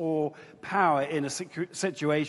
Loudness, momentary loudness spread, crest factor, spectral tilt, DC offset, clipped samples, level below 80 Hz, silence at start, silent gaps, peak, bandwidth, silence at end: -29 LUFS; 10 LU; 18 dB; -5 dB/octave; under 0.1%; under 0.1%; -72 dBFS; 0 s; none; -10 dBFS; 11.5 kHz; 0 s